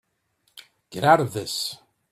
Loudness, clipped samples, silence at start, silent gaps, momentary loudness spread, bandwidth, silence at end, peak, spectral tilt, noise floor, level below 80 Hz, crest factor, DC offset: -22 LUFS; under 0.1%; 0.9 s; none; 19 LU; 16 kHz; 0.35 s; -4 dBFS; -4 dB/octave; -70 dBFS; -64 dBFS; 22 dB; under 0.1%